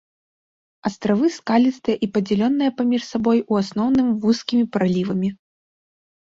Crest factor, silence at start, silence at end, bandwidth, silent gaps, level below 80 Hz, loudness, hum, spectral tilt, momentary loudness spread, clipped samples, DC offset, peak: 14 dB; 0.85 s; 0.85 s; 7.8 kHz; none; -58 dBFS; -20 LUFS; none; -6.5 dB/octave; 5 LU; under 0.1%; under 0.1%; -6 dBFS